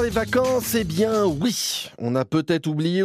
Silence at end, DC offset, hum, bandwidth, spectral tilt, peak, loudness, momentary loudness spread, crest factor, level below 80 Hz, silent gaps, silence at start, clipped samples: 0 s; under 0.1%; none; 15.5 kHz; -5 dB/octave; -6 dBFS; -22 LUFS; 5 LU; 16 dB; -46 dBFS; none; 0 s; under 0.1%